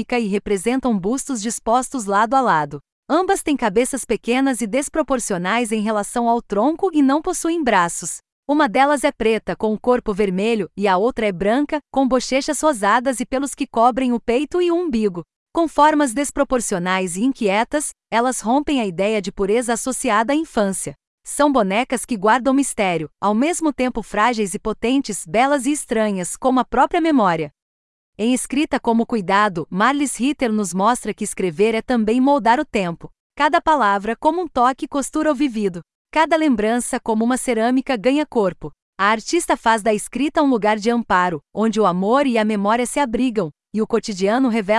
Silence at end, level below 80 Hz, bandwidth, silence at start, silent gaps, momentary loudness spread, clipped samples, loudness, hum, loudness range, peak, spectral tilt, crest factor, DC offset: 0 s; -46 dBFS; 12 kHz; 0 s; 2.92-3.03 s, 8.32-8.43 s, 15.36-15.46 s, 21.07-21.18 s, 27.62-28.13 s, 33.20-33.30 s, 35.95-36.05 s, 38.82-38.93 s; 6 LU; under 0.1%; -19 LUFS; none; 1 LU; -2 dBFS; -4.5 dB/octave; 16 dB; under 0.1%